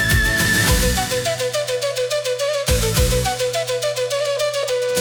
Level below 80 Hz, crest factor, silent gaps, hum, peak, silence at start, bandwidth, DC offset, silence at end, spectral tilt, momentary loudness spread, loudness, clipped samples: -28 dBFS; 14 dB; none; none; -6 dBFS; 0 s; over 20 kHz; under 0.1%; 0 s; -3 dB/octave; 6 LU; -19 LUFS; under 0.1%